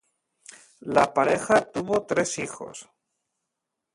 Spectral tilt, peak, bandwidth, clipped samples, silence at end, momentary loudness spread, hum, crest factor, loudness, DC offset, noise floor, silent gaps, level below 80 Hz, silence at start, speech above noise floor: -4 dB/octave; -6 dBFS; 11.5 kHz; under 0.1%; 1.1 s; 19 LU; none; 22 dB; -24 LUFS; under 0.1%; -83 dBFS; none; -62 dBFS; 0.85 s; 59 dB